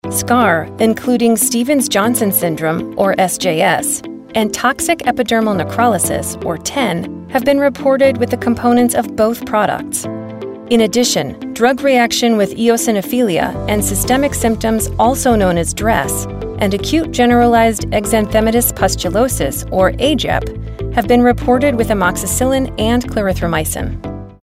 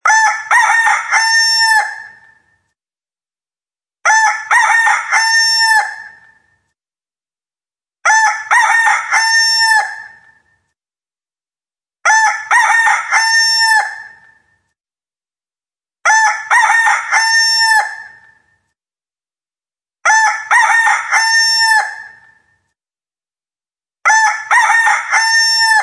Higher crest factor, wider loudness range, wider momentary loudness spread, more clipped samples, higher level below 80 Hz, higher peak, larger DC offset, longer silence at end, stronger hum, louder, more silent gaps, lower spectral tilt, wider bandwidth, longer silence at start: about the same, 12 dB vs 14 dB; about the same, 2 LU vs 3 LU; about the same, 7 LU vs 8 LU; neither; first, -32 dBFS vs -72 dBFS; about the same, -2 dBFS vs 0 dBFS; neither; about the same, 0.1 s vs 0 s; neither; second, -14 LUFS vs -10 LUFS; neither; first, -4 dB/octave vs 5 dB/octave; first, 16 kHz vs 11 kHz; about the same, 0.05 s vs 0.05 s